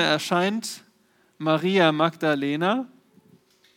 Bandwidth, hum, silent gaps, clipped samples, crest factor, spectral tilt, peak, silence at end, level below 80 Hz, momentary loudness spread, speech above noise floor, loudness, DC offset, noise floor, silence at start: 17.5 kHz; none; none; under 0.1%; 20 dB; -5 dB/octave; -4 dBFS; 0.9 s; -80 dBFS; 13 LU; 40 dB; -23 LUFS; under 0.1%; -63 dBFS; 0 s